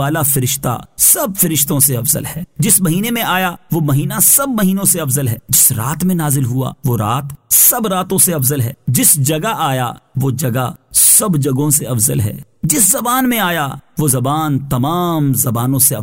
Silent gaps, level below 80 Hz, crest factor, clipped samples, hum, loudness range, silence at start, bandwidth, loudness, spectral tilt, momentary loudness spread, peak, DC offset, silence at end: none; -44 dBFS; 14 dB; under 0.1%; none; 2 LU; 0 s; 16.5 kHz; -13 LUFS; -4 dB/octave; 10 LU; 0 dBFS; 0.3%; 0 s